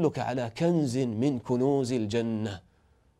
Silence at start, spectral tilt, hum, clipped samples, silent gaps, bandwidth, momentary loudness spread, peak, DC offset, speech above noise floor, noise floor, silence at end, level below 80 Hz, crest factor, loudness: 0 s; -7 dB/octave; none; under 0.1%; none; 13 kHz; 7 LU; -14 dBFS; under 0.1%; 37 dB; -64 dBFS; 0.6 s; -64 dBFS; 14 dB; -28 LUFS